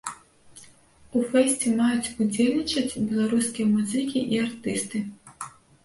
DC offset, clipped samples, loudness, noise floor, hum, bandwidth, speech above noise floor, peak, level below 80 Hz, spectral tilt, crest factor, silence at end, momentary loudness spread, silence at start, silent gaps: under 0.1%; under 0.1%; -25 LUFS; -54 dBFS; none; 11.5 kHz; 30 dB; -8 dBFS; -60 dBFS; -4 dB/octave; 18 dB; 0.35 s; 16 LU; 0.05 s; none